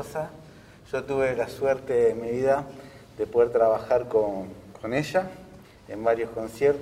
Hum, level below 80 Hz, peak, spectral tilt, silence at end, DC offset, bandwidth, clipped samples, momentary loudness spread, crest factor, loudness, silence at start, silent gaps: none; -56 dBFS; -8 dBFS; -6 dB/octave; 0 s; under 0.1%; 15.5 kHz; under 0.1%; 16 LU; 18 dB; -26 LUFS; 0 s; none